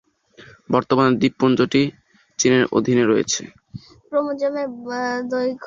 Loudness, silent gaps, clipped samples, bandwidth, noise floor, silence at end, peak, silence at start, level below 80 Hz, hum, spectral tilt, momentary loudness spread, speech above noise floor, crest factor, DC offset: -20 LUFS; none; under 0.1%; 7.6 kHz; -48 dBFS; 0 s; -2 dBFS; 0.4 s; -58 dBFS; none; -4.5 dB/octave; 10 LU; 29 dB; 18 dB; under 0.1%